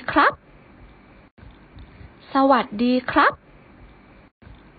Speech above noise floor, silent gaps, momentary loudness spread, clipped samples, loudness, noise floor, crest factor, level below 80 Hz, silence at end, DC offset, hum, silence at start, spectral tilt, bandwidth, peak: 30 dB; 1.31-1.37 s; 13 LU; under 0.1%; -19 LUFS; -48 dBFS; 20 dB; -50 dBFS; 1.45 s; under 0.1%; none; 0 s; -9 dB/octave; 5 kHz; -4 dBFS